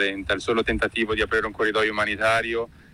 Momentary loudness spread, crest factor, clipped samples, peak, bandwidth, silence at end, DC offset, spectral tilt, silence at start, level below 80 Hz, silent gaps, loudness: 4 LU; 14 dB; under 0.1%; -10 dBFS; 12.5 kHz; 0.2 s; under 0.1%; -4.5 dB/octave; 0 s; -44 dBFS; none; -23 LUFS